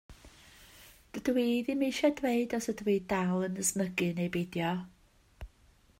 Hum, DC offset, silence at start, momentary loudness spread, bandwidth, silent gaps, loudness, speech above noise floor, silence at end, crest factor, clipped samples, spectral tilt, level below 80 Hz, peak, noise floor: none; under 0.1%; 0.1 s; 20 LU; 16 kHz; none; -31 LUFS; 33 dB; 0.5 s; 18 dB; under 0.1%; -5 dB/octave; -60 dBFS; -16 dBFS; -64 dBFS